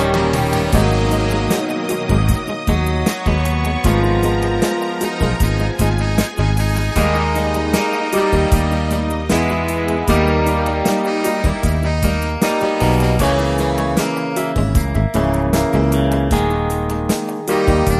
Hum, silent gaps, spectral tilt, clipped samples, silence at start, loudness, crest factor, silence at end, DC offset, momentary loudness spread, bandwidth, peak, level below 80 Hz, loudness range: none; none; -6 dB/octave; under 0.1%; 0 s; -17 LUFS; 16 dB; 0 s; under 0.1%; 4 LU; 13.5 kHz; 0 dBFS; -24 dBFS; 1 LU